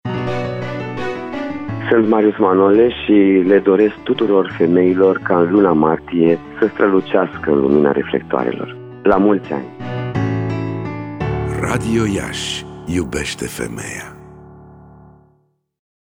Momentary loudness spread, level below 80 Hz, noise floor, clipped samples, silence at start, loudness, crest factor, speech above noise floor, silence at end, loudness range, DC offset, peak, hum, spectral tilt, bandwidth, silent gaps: 13 LU; -42 dBFS; -60 dBFS; under 0.1%; 0.05 s; -16 LUFS; 14 dB; 46 dB; 1.4 s; 9 LU; under 0.1%; -2 dBFS; none; -6.5 dB/octave; 16 kHz; none